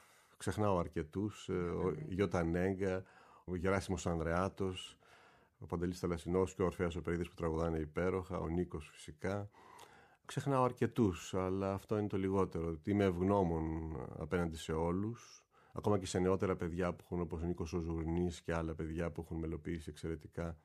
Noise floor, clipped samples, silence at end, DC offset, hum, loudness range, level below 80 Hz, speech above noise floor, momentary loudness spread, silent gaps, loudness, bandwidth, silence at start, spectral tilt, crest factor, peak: -65 dBFS; under 0.1%; 0.05 s; under 0.1%; none; 4 LU; -54 dBFS; 28 dB; 10 LU; none; -38 LUFS; 14 kHz; 0.4 s; -7 dB/octave; 18 dB; -20 dBFS